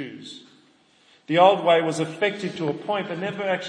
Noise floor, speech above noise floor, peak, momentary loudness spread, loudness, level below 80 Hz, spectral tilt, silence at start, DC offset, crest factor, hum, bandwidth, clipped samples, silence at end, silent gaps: -58 dBFS; 36 dB; -4 dBFS; 20 LU; -22 LUFS; -76 dBFS; -5 dB/octave; 0 s; under 0.1%; 20 dB; none; 10.5 kHz; under 0.1%; 0 s; none